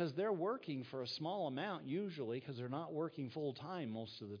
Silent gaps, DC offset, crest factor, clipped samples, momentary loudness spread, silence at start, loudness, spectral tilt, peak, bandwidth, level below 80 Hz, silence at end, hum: none; under 0.1%; 14 dB; under 0.1%; 7 LU; 0 s; -43 LUFS; -5 dB/octave; -28 dBFS; 5.2 kHz; under -90 dBFS; 0 s; none